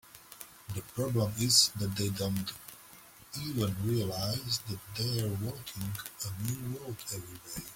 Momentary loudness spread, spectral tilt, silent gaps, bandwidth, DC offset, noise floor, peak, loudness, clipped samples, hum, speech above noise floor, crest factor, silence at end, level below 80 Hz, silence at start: 20 LU; -4 dB/octave; none; 17 kHz; under 0.1%; -55 dBFS; -10 dBFS; -32 LUFS; under 0.1%; none; 21 dB; 24 dB; 0 s; -60 dBFS; 0.05 s